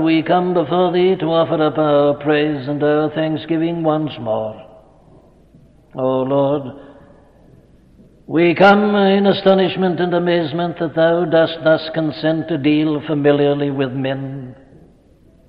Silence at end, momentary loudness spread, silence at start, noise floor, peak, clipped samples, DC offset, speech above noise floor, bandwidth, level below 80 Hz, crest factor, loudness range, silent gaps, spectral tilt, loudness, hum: 0.95 s; 9 LU; 0 s; -49 dBFS; -2 dBFS; under 0.1%; under 0.1%; 34 dB; 6 kHz; -54 dBFS; 14 dB; 8 LU; none; -9 dB/octave; -16 LUFS; none